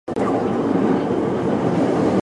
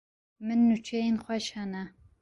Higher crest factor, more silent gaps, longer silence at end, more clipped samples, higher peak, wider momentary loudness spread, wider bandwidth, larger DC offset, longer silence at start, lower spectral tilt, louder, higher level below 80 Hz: about the same, 12 dB vs 14 dB; neither; second, 0 s vs 0.3 s; neither; first, -6 dBFS vs -16 dBFS; second, 2 LU vs 15 LU; about the same, 11 kHz vs 11 kHz; neither; second, 0.05 s vs 0.4 s; first, -8 dB/octave vs -5.5 dB/octave; first, -20 LUFS vs -29 LUFS; first, -48 dBFS vs -64 dBFS